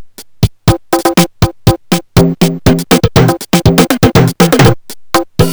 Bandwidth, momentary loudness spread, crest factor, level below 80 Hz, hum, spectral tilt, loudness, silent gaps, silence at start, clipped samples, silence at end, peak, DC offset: over 20 kHz; 7 LU; 10 dB; -26 dBFS; none; -5.5 dB/octave; -10 LUFS; none; 0 s; 0.9%; 0 s; 0 dBFS; under 0.1%